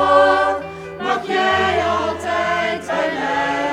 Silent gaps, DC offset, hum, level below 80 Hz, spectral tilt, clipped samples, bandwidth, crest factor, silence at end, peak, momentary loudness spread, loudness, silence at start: none; under 0.1%; none; -48 dBFS; -4 dB/octave; under 0.1%; 12.5 kHz; 18 dB; 0 s; 0 dBFS; 8 LU; -18 LUFS; 0 s